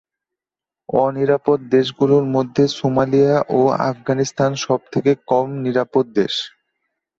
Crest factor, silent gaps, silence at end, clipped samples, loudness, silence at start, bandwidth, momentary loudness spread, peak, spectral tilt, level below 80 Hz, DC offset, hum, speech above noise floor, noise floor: 16 dB; none; 0.7 s; under 0.1%; -18 LUFS; 0.9 s; 7.6 kHz; 5 LU; -2 dBFS; -6 dB/octave; -58 dBFS; under 0.1%; none; 72 dB; -89 dBFS